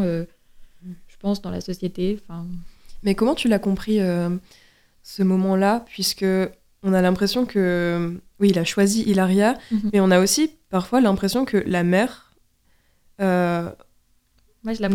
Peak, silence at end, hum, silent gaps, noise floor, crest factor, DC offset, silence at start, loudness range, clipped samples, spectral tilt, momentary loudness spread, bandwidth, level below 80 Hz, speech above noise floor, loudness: -4 dBFS; 0 s; none; none; -61 dBFS; 18 dB; under 0.1%; 0 s; 6 LU; under 0.1%; -5.5 dB/octave; 12 LU; 16.5 kHz; -48 dBFS; 40 dB; -21 LUFS